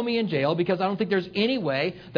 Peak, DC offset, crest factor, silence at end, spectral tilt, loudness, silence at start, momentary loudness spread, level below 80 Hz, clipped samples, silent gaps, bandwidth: -8 dBFS; under 0.1%; 16 dB; 0 s; -8 dB/octave; -25 LUFS; 0 s; 2 LU; -64 dBFS; under 0.1%; none; 5.4 kHz